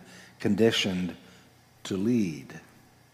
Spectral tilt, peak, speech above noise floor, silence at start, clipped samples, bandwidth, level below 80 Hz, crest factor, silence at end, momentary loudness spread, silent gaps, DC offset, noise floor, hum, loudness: -5 dB/octave; -10 dBFS; 30 dB; 0 s; under 0.1%; 15.5 kHz; -72 dBFS; 20 dB; 0.55 s; 23 LU; none; under 0.1%; -57 dBFS; none; -27 LUFS